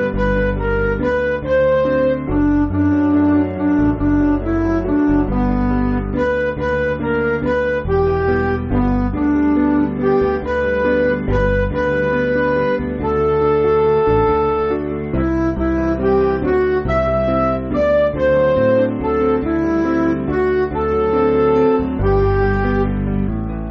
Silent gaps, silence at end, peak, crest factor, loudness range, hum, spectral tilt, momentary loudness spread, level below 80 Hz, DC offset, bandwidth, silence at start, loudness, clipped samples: none; 0 s; -4 dBFS; 12 dB; 2 LU; none; -7 dB/octave; 4 LU; -28 dBFS; under 0.1%; 6.2 kHz; 0 s; -17 LUFS; under 0.1%